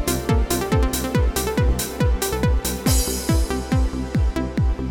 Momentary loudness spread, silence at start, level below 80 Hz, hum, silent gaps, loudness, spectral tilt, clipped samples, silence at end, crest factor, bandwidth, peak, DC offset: 3 LU; 0 s; -24 dBFS; none; none; -21 LUFS; -5 dB/octave; under 0.1%; 0 s; 14 dB; 18.5 kHz; -6 dBFS; under 0.1%